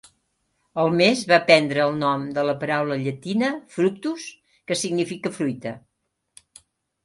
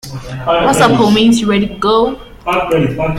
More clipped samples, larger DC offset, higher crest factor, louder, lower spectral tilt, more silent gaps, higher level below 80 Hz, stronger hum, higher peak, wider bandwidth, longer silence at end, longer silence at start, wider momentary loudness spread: neither; neither; first, 22 dB vs 12 dB; second, -22 LUFS vs -12 LUFS; about the same, -4.5 dB/octave vs -5 dB/octave; neither; second, -68 dBFS vs -36 dBFS; neither; about the same, 0 dBFS vs 0 dBFS; second, 11.5 kHz vs 15.5 kHz; first, 1.25 s vs 0 s; first, 0.75 s vs 0.05 s; first, 16 LU vs 10 LU